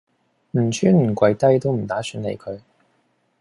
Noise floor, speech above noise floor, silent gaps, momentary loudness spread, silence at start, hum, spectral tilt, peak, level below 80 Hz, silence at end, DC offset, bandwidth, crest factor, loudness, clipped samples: -65 dBFS; 47 dB; none; 15 LU; 0.55 s; none; -7 dB/octave; -4 dBFS; -56 dBFS; 0.8 s; under 0.1%; 11.5 kHz; 18 dB; -20 LUFS; under 0.1%